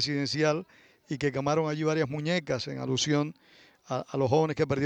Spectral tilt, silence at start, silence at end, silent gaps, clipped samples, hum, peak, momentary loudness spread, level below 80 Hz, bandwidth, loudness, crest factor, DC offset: -5 dB/octave; 0 s; 0 s; none; under 0.1%; none; -10 dBFS; 9 LU; -62 dBFS; 9.4 kHz; -29 LUFS; 18 dB; under 0.1%